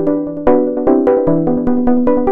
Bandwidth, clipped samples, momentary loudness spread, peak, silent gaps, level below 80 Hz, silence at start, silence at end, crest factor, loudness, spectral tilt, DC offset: 3.3 kHz; under 0.1%; 3 LU; 0 dBFS; none; -34 dBFS; 0 s; 0 s; 12 dB; -13 LUFS; -11.5 dB/octave; under 0.1%